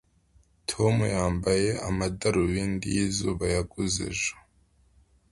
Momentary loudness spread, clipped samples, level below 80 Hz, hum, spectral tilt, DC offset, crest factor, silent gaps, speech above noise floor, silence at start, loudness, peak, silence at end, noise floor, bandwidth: 5 LU; under 0.1%; -44 dBFS; none; -5 dB/octave; under 0.1%; 18 dB; none; 37 dB; 0.7 s; -27 LUFS; -10 dBFS; 0.9 s; -63 dBFS; 11.5 kHz